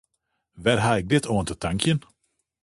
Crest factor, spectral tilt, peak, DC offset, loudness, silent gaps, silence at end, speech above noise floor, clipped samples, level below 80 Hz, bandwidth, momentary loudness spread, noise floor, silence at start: 20 dB; -5 dB/octave; -4 dBFS; under 0.1%; -24 LUFS; none; 0.65 s; 54 dB; under 0.1%; -46 dBFS; 11.5 kHz; 6 LU; -77 dBFS; 0.55 s